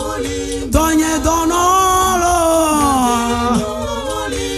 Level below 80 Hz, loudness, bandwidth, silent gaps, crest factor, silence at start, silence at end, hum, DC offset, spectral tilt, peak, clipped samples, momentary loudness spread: -28 dBFS; -15 LUFS; 15.5 kHz; none; 16 dB; 0 s; 0 s; none; under 0.1%; -4 dB/octave; 0 dBFS; under 0.1%; 9 LU